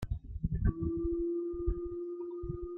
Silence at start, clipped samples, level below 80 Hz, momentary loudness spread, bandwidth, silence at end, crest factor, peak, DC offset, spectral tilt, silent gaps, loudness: 0 s; under 0.1%; -40 dBFS; 7 LU; 4.2 kHz; 0 s; 20 dB; -16 dBFS; under 0.1%; -11 dB/octave; none; -36 LUFS